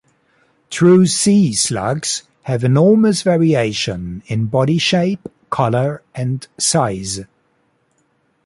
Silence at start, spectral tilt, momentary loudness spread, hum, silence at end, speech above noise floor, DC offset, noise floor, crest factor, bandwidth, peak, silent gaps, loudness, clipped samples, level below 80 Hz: 0.7 s; -5 dB/octave; 12 LU; none; 1.2 s; 47 dB; under 0.1%; -62 dBFS; 14 dB; 11.5 kHz; -2 dBFS; none; -16 LUFS; under 0.1%; -48 dBFS